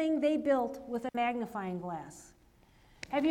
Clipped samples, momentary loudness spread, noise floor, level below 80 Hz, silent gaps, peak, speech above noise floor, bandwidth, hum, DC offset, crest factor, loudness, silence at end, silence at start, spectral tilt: under 0.1%; 17 LU; -63 dBFS; -66 dBFS; none; -18 dBFS; 30 dB; 14.5 kHz; none; under 0.1%; 16 dB; -33 LUFS; 0 s; 0 s; -6 dB/octave